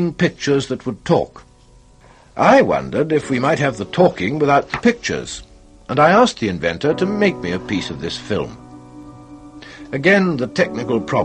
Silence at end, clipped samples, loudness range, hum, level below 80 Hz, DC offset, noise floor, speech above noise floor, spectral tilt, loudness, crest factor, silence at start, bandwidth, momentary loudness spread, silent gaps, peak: 0 s; under 0.1%; 5 LU; none; -48 dBFS; under 0.1%; -48 dBFS; 31 dB; -5.5 dB/octave; -17 LUFS; 16 dB; 0 s; 9.6 kHz; 13 LU; none; -2 dBFS